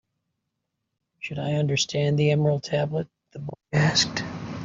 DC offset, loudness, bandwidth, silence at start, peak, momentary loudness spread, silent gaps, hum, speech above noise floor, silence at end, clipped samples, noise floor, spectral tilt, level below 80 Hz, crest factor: under 0.1%; -24 LUFS; 7.6 kHz; 1.2 s; -6 dBFS; 17 LU; none; none; 57 dB; 0 s; under 0.1%; -80 dBFS; -5 dB/octave; -58 dBFS; 20 dB